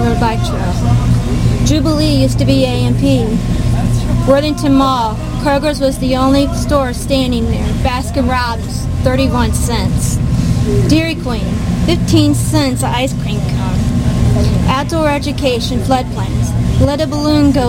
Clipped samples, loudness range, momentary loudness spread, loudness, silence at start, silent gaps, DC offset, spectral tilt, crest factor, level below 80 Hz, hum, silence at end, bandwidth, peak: under 0.1%; 2 LU; 5 LU; -14 LUFS; 0 s; none; 0.3%; -6 dB/octave; 12 dB; -22 dBFS; 60 Hz at -25 dBFS; 0 s; 16.5 kHz; 0 dBFS